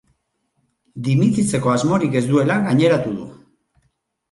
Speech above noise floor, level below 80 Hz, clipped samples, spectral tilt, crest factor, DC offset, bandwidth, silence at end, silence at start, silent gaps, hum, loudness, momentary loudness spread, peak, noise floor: 53 dB; -56 dBFS; under 0.1%; -6.5 dB/octave; 16 dB; under 0.1%; 11.5 kHz; 1 s; 0.95 s; none; none; -18 LUFS; 13 LU; -4 dBFS; -70 dBFS